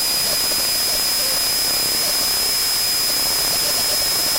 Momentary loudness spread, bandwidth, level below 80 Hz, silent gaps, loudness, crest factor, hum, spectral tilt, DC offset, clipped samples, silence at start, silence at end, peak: 0 LU; 16 kHz; -44 dBFS; none; -16 LUFS; 12 dB; none; 0.5 dB/octave; under 0.1%; under 0.1%; 0 s; 0 s; -6 dBFS